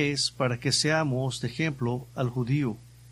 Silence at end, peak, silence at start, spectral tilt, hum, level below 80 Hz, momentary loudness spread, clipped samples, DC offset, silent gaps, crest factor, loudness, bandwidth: 0 s; -10 dBFS; 0 s; -4.5 dB/octave; none; -56 dBFS; 7 LU; under 0.1%; under 0.1%; none; 18 dB; -27 LUFS; 14 kHz